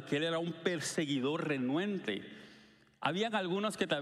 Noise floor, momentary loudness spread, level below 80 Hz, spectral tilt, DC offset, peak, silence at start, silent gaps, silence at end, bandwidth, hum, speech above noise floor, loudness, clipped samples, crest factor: -61 dBFS; 6 LU; -78 dBFS; -4.5 dB/octave; under 0.1%; -16 dBFS; 0 s; none; 0 s; 14.5 kHz; none; 27 dB; -35 LUFS; under 0.1%; 20 dB